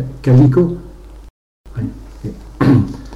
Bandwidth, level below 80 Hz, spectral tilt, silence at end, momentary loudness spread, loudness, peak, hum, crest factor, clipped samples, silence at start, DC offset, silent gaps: 6.2 kHz; -34 dBFS; -9.5 dB/octave; 0 s; 20 LU; -14 LUFS; -2 dBFS; none; 12 dB; under 0.1%; 0 s; under 0.1%; 1.30-1.64 s